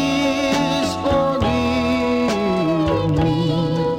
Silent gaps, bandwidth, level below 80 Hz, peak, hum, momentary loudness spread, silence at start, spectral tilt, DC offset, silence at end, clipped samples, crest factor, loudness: none; 16 kHz; -36 dBFS; -6 dBFS; none; 1 LU; 0 s; -6 dB/octave; under 0.1%; 0 s; under 0.1%; 12 dB; -19 LUFS